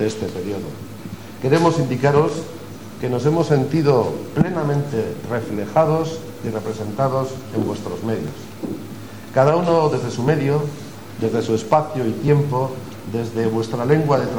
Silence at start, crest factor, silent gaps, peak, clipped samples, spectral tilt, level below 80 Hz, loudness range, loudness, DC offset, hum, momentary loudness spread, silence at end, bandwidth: 0 s; 18 dB; none; -2 dBFS; under 0.1%; -7 dB/octave; -52 dBFS; 4 LU; -20 LUFS; 0.8%; none; 15 LU; 0 s; 20 kHz